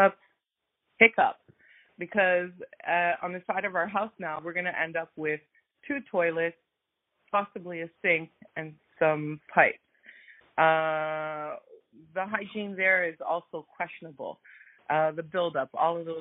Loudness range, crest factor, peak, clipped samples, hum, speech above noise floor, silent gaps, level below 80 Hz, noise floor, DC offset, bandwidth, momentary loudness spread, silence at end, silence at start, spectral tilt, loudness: 5 LU; 24 dB; -4 dBFS; under 0.1%; none; 55 dB; none; -74 dBFS; -84 dBFS; under 0.1%; 4 kHz; 16 LU; 0 s; 0 s; -9 dB/octave; -28 LUFS